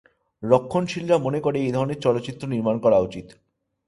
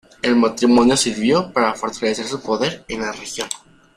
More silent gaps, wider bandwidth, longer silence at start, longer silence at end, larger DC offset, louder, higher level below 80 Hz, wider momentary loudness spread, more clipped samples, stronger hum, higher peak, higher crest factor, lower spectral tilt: neither; second, 11.5 kHz vs 15.5 kHz; first, 0.4 s vs 0.25 s; first, 0.55 s vs 0.4 s; neither; second, -22 LUFS vs -19 LUFS; second, -56 dBFS vs -50 dBFS; second, 9 LU vs 12 LU; neither; neither; about the same, -2 dBFS vs -2 dBFS; about the same, 20 dB vs 18 dB; first, -7 dB/octave vs -3.5 dB/octave